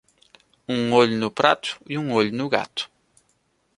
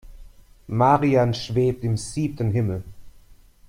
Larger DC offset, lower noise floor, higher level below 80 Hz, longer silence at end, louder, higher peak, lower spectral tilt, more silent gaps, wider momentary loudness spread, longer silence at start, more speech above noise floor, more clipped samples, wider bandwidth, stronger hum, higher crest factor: neither; first, -68 dBFS vs -50 dBFS; second, -64 dBFS vs -46 dBFS; first, 0.9 s vs 0.35 s; about the same, -22 LUFS vs -22 LUFS; first, 0 dBFS vs -4 dBFS; second, -5 dB/octave vs -7 dB/octave; neither; about the same, 12 LU vs 10 LU; first, 0.7 s vs 0.05 s; first, 46 dB vs 29 dB; neither; about the same, 11.5 kHz vs 11 kHz; neither; about the same, 22 dB vs 18 dB